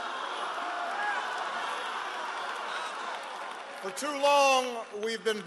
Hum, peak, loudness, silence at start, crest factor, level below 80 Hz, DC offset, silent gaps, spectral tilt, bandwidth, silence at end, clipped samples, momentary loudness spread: none; -12 dBFS; -31 LUFS; 0 s; 18 dB; -86 dBFS; under 0.1%; none; -1 dB/octave; 12.5 kHz; 0 s; under 0.1%; 13 LU